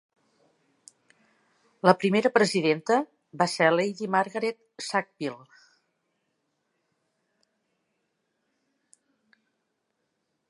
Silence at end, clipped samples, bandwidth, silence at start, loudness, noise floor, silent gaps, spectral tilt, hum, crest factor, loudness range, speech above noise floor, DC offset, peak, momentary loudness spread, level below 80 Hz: 5.15 s; under 0.1%; 11.5 kHz; 1.85 s; -25 LUFS; -78 dBFS; none; -5 dB/octave; none; 28 dB; 13 LU; 54 dB; under 0.1%; -2 dBFS; 13 LU; -80 dBFS